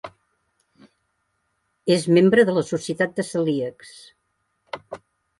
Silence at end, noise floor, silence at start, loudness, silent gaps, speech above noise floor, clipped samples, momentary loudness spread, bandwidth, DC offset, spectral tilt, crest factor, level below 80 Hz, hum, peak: 0.4 s; -73 dBFS; 0.05 s; -20 LUFS; none; 52 dB; under 0.1%; 25 LU; 11.5 kHz; under 0.1%; -6 dB/octave; 20 dB; -66 dBFS; none; -4 dBFS